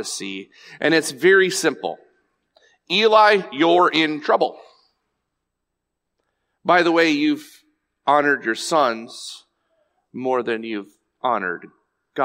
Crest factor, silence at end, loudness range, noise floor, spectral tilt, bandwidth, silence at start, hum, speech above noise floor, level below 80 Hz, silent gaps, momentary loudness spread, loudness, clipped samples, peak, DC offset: 18 dB; 0 s; 6 LU; -79 dBFS; -3.5 dB/octave; 16 kHz; 0 s; none; 60 dB; -76 dBFS; none; 17 LU; -19 LUFS; under 0.1%; -2 dBFS; under 0.1%